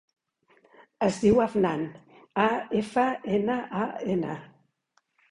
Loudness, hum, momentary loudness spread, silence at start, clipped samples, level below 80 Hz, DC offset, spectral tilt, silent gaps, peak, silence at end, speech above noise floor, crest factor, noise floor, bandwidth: -27 LUFS; none; 12 LU; 1 s; under 0.1%; -58 dBFS; under 0.1%; -6.5 dB/octave; none; -10 dBFS; 0.85 s; 46 dB; 18 dB; -72 dBFS; 11 kHz